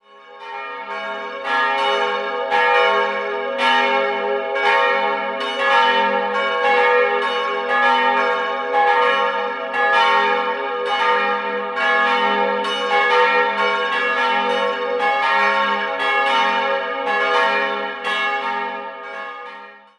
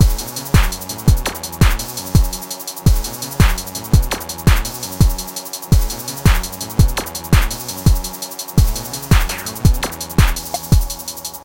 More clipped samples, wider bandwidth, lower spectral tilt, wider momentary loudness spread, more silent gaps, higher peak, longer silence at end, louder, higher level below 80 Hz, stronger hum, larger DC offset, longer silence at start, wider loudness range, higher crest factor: neither; second, 11 kHz vs 17.5 kHz; second, -2.5 dB/octave vs -4.5 dB/octave; first, 12 LU vs 8 LU; neither; about the same, -2 dBFS vs 0 dBFS; first, 0.2 s vs 0 s; about the same, -18 LUFS vs -18 LUFS; second, -72 dBFS vs -18 dBFS; neither; second, under 0.1% vs 0.3%; first, 0.15 s vs 0 s; about the same, 2 LU vs 1 LU; about the same, 18 dB vs 16 dB